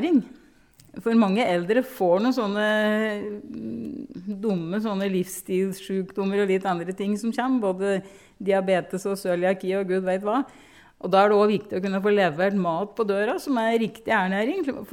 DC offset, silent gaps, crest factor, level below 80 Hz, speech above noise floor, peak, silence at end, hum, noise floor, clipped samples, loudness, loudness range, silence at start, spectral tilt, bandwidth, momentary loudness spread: under 0.1%; none; 18 dB; -64 dBFS; 31 dB; -6 dBFS; 0.05 s; none; -55 dBFS; under 0.1%; -24 LUFS; 4 LU; 0 s; -6 dB/octave; 17 kHz; 11 LU